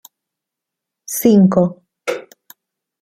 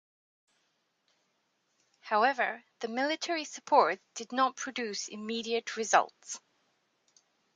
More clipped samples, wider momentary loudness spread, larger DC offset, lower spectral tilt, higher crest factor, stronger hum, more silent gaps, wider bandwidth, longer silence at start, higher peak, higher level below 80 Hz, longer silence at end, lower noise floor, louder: neither; about the same, 15 LU vs 13 LU; neither; first, -6.5 dB/octave vs -1.5 dB/octave; second, 16 dB vs 24 dB; neither; neither; first, 16 kHz vs 9.6 kHz; second, 1.1 s vs 2.05 s; first, -2 dBFS vs -10 dBFS; first, -58 dBFS vs -86 dBFS; second, 0.8 s vs 1.2 s; first, -83 dBFS vs -77 dBFS; first, -15 LUFS vs -31 LUFS